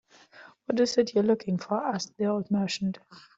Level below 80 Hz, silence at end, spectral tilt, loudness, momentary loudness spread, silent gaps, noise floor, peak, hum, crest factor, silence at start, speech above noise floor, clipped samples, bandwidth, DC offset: -70 dBFS; 0.2 s; -5.5 dB/octave; -28 LUFS; 8 LU; none; -53 dBFS; -10 dBFS; none; 18 dB; 0.35 s; 26 dB; under 0.1%; 8 kHz; under 0.1%